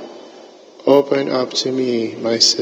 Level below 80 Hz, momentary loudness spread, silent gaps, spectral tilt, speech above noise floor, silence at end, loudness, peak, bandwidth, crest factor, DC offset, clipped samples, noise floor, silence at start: -74 dBFS; 8 LU; none; -3 dB/octave; 25 dB; 0 s; -17 LUFS; 0 dBFS; 16 kHz; 18 dB; under 0.1%; under 0.1%; -41 dBFS; 0 s